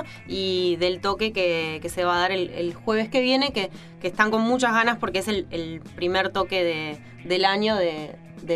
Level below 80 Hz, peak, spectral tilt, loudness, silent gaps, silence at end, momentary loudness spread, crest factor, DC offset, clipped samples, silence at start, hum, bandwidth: -54 dBFS; -2 dBFS; -4.5 dB/octave; -24 LUFS; none; 0 s; 12 LU; 22 dB; under 0.1%; under 0.1%; 0 s; none; 14.5 kHz